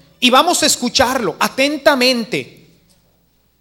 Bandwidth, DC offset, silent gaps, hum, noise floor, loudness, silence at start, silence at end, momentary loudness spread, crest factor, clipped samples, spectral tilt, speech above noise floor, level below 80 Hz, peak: 17.5 kHz; under 0.1%; none; none; -58 dBFS; -14 LUFS; 0.2 s; 1.15 s; 8 LU; 16 dB; under 0.1%; -2 dB/octave; 43 dB; -50 dBFS; 0 dBFS